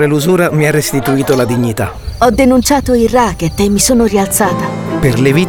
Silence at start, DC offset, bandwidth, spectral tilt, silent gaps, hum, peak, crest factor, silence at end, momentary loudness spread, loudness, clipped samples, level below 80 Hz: 0 s; under 0.1%; over 20 kHz; -5 dB/octave; none; none; 0 dBFS; 10 dB; 0 s; 5 LU; -11 LUFS; under 0.1%; -28 dBFS